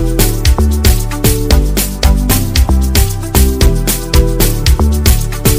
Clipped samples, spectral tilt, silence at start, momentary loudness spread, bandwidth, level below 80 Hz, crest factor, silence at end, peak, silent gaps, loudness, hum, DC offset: 1%; -4.5 dB/octave; 0 s; 2 LU; 16.5 kHz; -12 dBFS; 10 dB; 0 s; 0 dBFS; none; -12 LUFS; none; under 0.1%